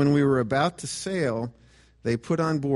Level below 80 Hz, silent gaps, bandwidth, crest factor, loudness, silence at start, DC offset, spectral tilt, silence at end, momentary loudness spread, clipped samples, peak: -56 dBFS; none; 11.5 kHz; 16 dB; -26 LUFS; 0 s; under 0.1%; -6 dB/octave; 0 s; 11 LU; under 0.1%; -10 dBFS